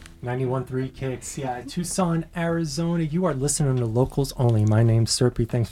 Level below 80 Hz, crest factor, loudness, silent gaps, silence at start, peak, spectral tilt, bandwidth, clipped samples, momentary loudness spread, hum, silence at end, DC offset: -44 dBFS; 16 dB; -24 LUFS; none; 0 s; -6 dBFS; -6 dB/octave; 15 kHz; under 0.1%; 10 LU; none; 0 s; under 0.1%